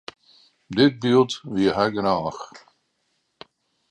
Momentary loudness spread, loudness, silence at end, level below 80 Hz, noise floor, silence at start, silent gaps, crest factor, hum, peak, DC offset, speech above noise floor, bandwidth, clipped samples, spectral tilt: 19 LU; -21 LUFS; 1.35 s; -58 dBFS; -72 dBFS; 0.7 s; none; 20 dB; none; -4 dBFS; under 0.1%; 51 dB; 9.6 kHz; under 0.1%; -6 dB/octave